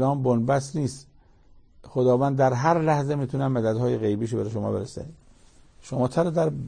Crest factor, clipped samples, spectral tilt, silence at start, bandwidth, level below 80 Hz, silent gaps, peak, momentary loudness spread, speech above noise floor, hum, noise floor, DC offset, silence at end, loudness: 18 dB; under 0.1%; -7.5 dB/octave; 0 s; 9.8 kHz; -54 dBFS; none; -6 dBFS; 11 LU; 30 dB; none; -53 dBFS; under 0.1%; 0 s; -24 LUFS